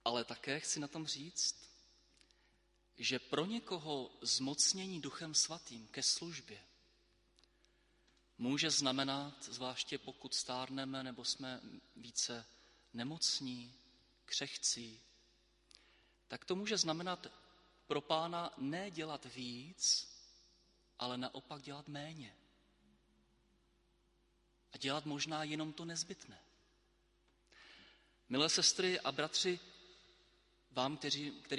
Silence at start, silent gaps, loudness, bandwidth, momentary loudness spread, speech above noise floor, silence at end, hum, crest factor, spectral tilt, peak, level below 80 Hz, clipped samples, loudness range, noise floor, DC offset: 0.05 s; none; -38 LUFS; 11.5 kHz; 17 LU; 35 dB; 0 s; none; 24 dB; -2 dB/octave; -18 dBFS; -78 dBFS; under 0.1%; 9 LU; -75 dBFS; under 0.1%